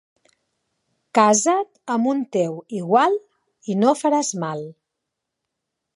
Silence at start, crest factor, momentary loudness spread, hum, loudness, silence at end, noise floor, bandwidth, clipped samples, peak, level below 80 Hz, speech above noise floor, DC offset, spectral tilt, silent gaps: 1.15 s; 20 dB; 13 LU; none; -20 LUFS; 1.25 s; -81 dBFS; 11.5 kHz; under 0.1%; -2 dBFS; -78 dBFS; 61 dB; under 0.1%; -4.5 dB/octave; none